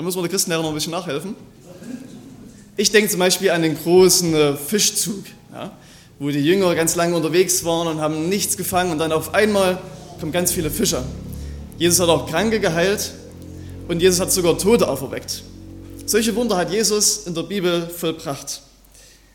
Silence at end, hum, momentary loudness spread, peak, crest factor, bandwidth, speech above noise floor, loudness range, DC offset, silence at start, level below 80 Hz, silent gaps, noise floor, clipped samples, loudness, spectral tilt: 0.75 s; none; 19 LU; 0 dBFS; 20 dB; 17.5 kHz; 29 dB; 4 LU; under 0.1%; 0 s; -44 dBFS; none; -48 dBFS; under 0.1%; -18 LUFS; -3.5 dB/octave